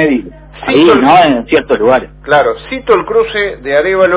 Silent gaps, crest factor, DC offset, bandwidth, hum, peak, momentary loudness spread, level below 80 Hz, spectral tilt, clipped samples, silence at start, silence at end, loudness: none; 10 dB; under 0.1%; 4 kHz; none; 0 dBFS; 9 LU; -38 dBFS; -9 dB/octave; 0.5%; 0 s; 0 s; -10 LUFS